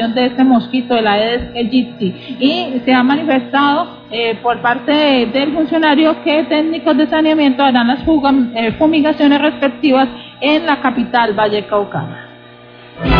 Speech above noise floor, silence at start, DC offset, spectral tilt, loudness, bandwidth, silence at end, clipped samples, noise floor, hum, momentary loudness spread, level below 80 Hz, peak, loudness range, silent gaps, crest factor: 25 dB; 0 s; under 0.1%; -8 dB/octave; -13 LUFS; 5.4 kHz; 0 s; under 0.1%; -38 dBFS; 60 Hz at -30 dBFS; 7 LU; -36 dBFS; 0 dBFS; 3 LU; none; 12 dB